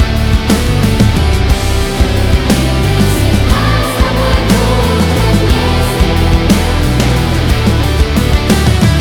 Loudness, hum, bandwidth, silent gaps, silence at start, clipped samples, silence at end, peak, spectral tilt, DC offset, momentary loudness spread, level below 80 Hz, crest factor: -11 LUFS; none; 18.5 kHz; none; 0 s; under 0.1%; 0 s; 0 dBFS; -5.5 dB/octave; under 0.1%; 2 LU; -14 dBFS; 10 dB